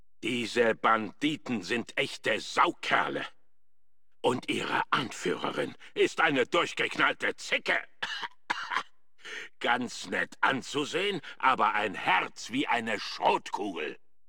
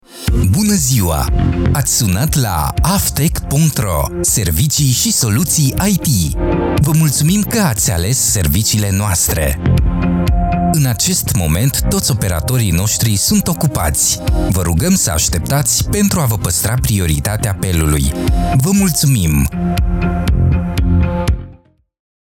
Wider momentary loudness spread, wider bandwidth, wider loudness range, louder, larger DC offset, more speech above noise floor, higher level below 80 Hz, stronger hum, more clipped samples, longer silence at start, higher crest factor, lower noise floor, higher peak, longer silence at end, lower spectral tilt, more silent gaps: first, 10 LU vs 4 LU; about the same, 17.5 kHz vs 17.5 kHz; about the same, 3 LU vs 1 LU; second, -29 LUFS vs -14 LUFS; first, 0.3% vs under 0.1%; first, 56 dB vs 31 dB; second, -72 dBFS vs -22 dBFS; neither; neither; about the same, 0.2 s vs 0.1 s; first, 20 dB vs 12 dB; first, -86 dBFS vs -44 dBFS; second, -10 dBFS vs -2 dBFS; second, 0.35 s vs 0.7 s; about the same, -3.5 dB/octave vs -4.5 dB/octave; neither